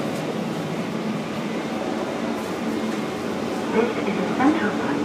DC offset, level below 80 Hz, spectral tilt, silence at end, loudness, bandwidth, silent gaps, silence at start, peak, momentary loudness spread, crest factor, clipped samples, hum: under 0.1%; -60 dBFS; -5.5 dB/octave; 0 s; -25 LUFS; 15.5 kHz; none; 0 s; -8 dBFS; 7 LU; 18 dB; under 0.1%; none